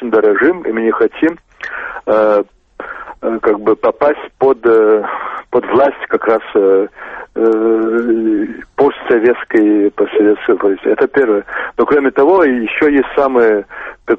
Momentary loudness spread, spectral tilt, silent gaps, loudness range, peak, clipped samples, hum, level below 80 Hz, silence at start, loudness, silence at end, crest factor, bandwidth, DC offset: 12 LU; -7.5 dB/octave; none; 3 LU; 0 dBFS; under 0.1%; none; -48 dBFS; 0 s; -13 LUFS; 0 s; 12 dB; 4.7 kHz; under 0.1%